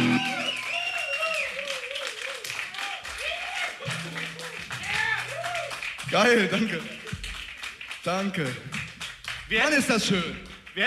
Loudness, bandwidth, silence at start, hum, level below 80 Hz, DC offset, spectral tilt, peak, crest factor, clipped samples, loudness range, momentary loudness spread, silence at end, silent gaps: -27 LUFS; 15 kHz; 0 s; none; -54 dBFS; under 0.1%; -3.5 dB/octave; -10 dBFS; 18 dB; under 0.1%; 4 LU; 14 LU; 0 s; none